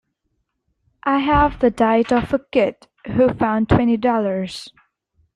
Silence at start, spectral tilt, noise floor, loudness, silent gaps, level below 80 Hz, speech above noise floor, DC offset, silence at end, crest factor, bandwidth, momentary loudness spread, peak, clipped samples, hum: 1.05 s; -7.5 dB/octave; -72 dBFS; -18 LUFS; none; -38 dBFS; 55 dB; under 0.1%; 0.65 s; 16 dB; 11 kHz; 10 LU; -2 dBFS; under 0.1%; none